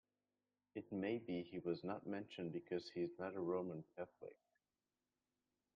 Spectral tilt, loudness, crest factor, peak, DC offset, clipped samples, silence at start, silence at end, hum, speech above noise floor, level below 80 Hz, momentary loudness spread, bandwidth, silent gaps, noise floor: -6 dB/octave; -47 LUFS; 18 dB; -30 dBFS; under 0.1%; under 0.1%; 0.75 s; 1.4 s; none; over 44 dB; -86 dBFS; 10 LU; 5.6 kHz; none; under -90 dBFS